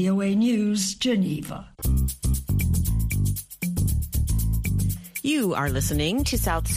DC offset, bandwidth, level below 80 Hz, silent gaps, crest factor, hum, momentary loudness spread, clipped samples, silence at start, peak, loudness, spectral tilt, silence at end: under 0.1%; 15.5 kHz; -30 dBFS; none; 14 dB; none; 6 LU; under 0.1%; 0 s; -10 dBFS; -25 LUFS; -5 dB/octave; 0 s